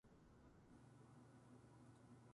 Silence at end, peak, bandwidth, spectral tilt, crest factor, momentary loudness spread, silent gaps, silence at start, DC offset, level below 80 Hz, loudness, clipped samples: 0 s; -54 dBFS; 11 kHz; -6.5 dB/octave; 12 dB; 3 LU; none; 0.05 s; under 0.1%; -80 dBFS; -68 LUFS; under 0.1%